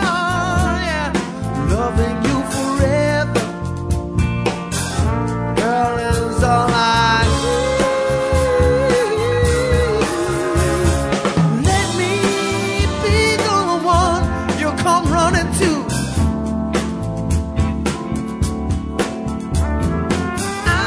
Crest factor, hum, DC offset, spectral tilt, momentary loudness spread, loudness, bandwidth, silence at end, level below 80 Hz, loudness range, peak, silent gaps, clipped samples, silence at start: 16 dB; none; under 0.1%; -5 dB/octave; 7 LU; -18 LUFS; 11 kHz; 0 s; -26 dBFS; 5 LU; -2 dBFS; none; under 0.1%; 0 s